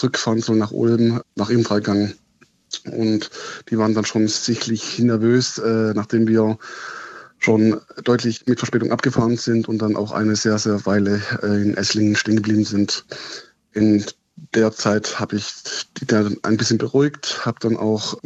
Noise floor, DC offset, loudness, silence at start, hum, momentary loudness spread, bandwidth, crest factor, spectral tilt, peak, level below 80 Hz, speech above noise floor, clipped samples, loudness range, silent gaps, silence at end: -57 dBFS; under 0.1%; -19 LUFS; 0 s; none; 10 LU; 8.2 kHz; 16 dB; -5 dB/octave; -4 dBFS; -62 dBFS; 38 dB; under 0.1%; 2 LU; none; 0.05 s